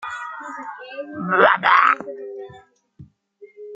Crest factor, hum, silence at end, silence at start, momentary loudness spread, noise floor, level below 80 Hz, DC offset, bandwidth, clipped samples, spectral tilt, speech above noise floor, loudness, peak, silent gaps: 20 dB; none; 0 s; 0 s; 20 LU; -49 dBFS; -68 dBFS; under 0.1%; 8.8 kHz; under 0.1%; -5 dB/octave; 30 dB; -17 LUFS; -2 dBFS; none